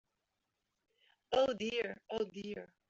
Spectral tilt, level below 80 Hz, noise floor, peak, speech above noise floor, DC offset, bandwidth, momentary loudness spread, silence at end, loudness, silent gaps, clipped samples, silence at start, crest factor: -2 dB/octave; -72 dBFS; -86 dBFS; -18 dBFS; 49 dB; under 0.1%; 7.8 kHz; 11 LU; 0.25 s; -37 LUFS; none; under 0.1%; 1.3 s; 22 dB